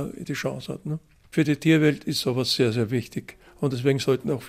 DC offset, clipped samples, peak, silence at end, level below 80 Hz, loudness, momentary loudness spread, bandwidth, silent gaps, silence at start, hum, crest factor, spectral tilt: under 0.1%; under 0.1%; -6 dBFS; 0 s; -58 dBFS; -24 LUFS; 14 LU; 16 kHz; none; 0 s; none; 18 dB; -5.5 dB/octave